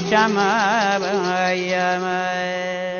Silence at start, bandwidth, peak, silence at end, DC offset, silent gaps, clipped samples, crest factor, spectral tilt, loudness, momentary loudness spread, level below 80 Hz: 0 s; 7 kHz; -2 dBFS; 0 s; under 0.1%; none; under 0.1%; 18 dB; -4 dB/octave; -20 LUFS; 6 LU; -62 dBFS